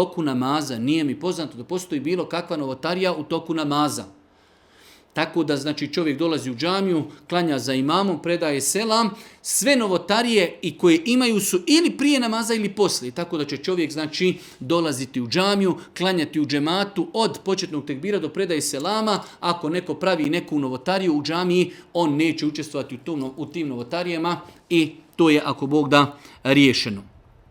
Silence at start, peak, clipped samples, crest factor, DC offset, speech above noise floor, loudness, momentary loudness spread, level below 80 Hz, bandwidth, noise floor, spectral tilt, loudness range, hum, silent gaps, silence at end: 0 s; 0 dBFS; under 0.1%; 22 dB; under 0.1%; 34 dB; -22 LUFS; 10 LU; -64 dBFS; 18.5 kHz; -56 dBFS; -4.5 dB/octave; 6 LU; none; none; 0.45 s